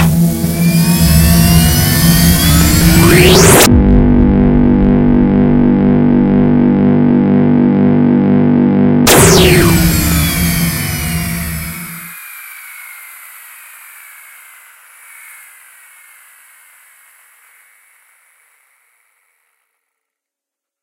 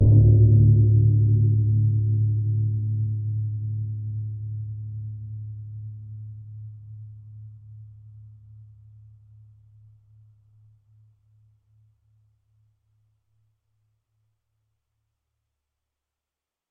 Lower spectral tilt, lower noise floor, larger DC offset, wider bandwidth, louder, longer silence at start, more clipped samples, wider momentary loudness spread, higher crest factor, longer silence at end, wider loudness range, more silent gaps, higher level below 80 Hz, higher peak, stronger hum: second, -5 dB/octave vs -21 dB/octave; second, -84 dBFS vs -89 dBFS; neither; first, over 20 kHz vs 0.7 kHz; first, -9 LUFS vs -22 LUFS; about the same, 0 s vs 0 s; first, 0.4% vs under 0.1%; second, 19 LU vs 26 LU; second, 10 dB vs 20 dB; second, 7.7 s vs 8.85 s; second, 15 LU vs 26 LU; neither; first, -22 dBFS vs -40 dBFS; first, 0 dBFS vs -6 dBFS; neither